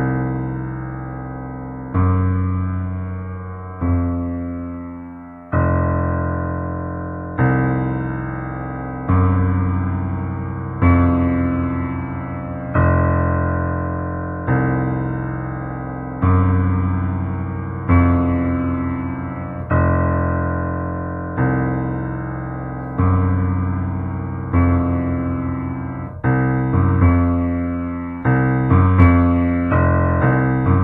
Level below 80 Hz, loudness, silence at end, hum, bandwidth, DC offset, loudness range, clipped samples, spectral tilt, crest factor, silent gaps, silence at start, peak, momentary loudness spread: -36 dBFS; -20 LUFS; 0 s; none; 3.1 kHz; under 0.1%; 6 LU; under 0.1%; -12.5 dB/octave; 18 dB; none; 0 s; 0 dBFS; 12 LU